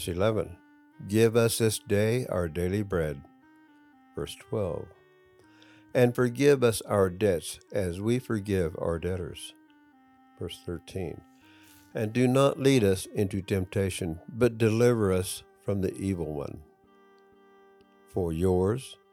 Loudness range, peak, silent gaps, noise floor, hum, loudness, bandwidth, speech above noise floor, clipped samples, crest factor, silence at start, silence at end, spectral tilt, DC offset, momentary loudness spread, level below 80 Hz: 8 LU; -10 dBFS; none; -59 dBFS; none; -28 LUFS; 18 kHz; 32 dB; under 0.1%; 20 dB; 0 s; 0.2 s; -6 dB/octave; under 0.1%; 16 LU; -56 dBFS